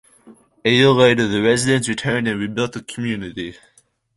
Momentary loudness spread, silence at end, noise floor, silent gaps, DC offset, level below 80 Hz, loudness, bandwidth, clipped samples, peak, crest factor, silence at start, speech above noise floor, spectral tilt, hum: 13 LU; 0.65 s; -49 dBFS; none; under 0.1%; -52 dBFS; -18 LUFS; 11.5 kHz; under 0.1%; -2 dBFS; 18 dB; 0.25 s; 31 dB; -4.5 dB/octave; none